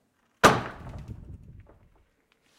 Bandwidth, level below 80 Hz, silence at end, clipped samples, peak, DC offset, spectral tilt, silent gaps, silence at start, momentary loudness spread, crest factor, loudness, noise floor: 16.5 kHz; -50 dBFS; 1.2 s; under 0.1%; -6 dBFS; under 0.1%; -4 dB/octave; none; 0.45 s; 24 LU; 24 dB; -22 LUFS; -68 dBFS